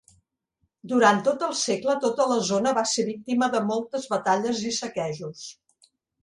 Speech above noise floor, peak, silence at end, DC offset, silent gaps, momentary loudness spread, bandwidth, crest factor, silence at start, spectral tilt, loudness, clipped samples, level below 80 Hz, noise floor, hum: 51 dB; -4 dBFS; 0.7 s; under 0.1%; none; 11 LU; 11.5 kHz; 20 dB; 0.85 s; -3.5 dB/octave; -24 LUFS; under 0.1%; -70 dBFS; -75 dBFS; none